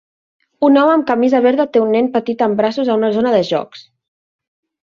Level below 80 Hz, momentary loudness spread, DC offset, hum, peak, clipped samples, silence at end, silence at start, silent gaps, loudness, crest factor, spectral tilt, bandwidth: -62 dBFS; 6 LU; under 0.1%; none; -2 dBFS; under 0.1%; 1.1 s; 0.6 s; none; -14 LUFS; 14 dB; -7 dB/octave; 7.2 kHz